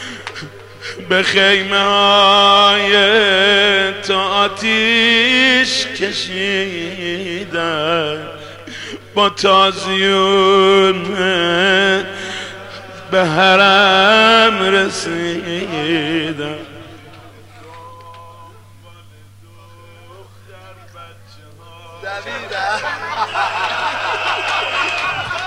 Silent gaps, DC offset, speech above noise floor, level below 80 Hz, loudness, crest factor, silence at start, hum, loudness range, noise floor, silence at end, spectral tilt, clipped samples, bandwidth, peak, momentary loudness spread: none; 0.4%; 29 dB; -58 dBFS; -13 LUFS; 16 dB; 0 s; 50 Hz at -45 dBFS; 13 LU; -42 dBFS; 0 s; -3.5 dB/octave; under 0.1%; 15 kHz; 0 dBFS; 19 LU